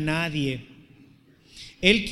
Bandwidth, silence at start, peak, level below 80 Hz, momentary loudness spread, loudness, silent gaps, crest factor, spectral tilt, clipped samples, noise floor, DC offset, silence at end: 13 kHz; 0 s; -2 dBFS; -48 dBFS; 23 LU; -24 LUFS; none; 24 dB; -5 dB/octave; under 0.1%; -55 dBFS; under 0.1%; 0 s